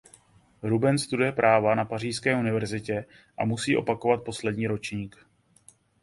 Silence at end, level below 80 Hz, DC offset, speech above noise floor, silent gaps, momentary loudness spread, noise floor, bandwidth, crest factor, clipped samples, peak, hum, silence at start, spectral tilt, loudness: 0.95 s; -60 dBFS; under 0.1%; 33 dB; none; 12 LU; -58 dBFS; 11.5 kHz; 20 dB; under 0.1%; -6 dBFS; none; 0.65 s; -5.5 dB/octave; -26 LUFS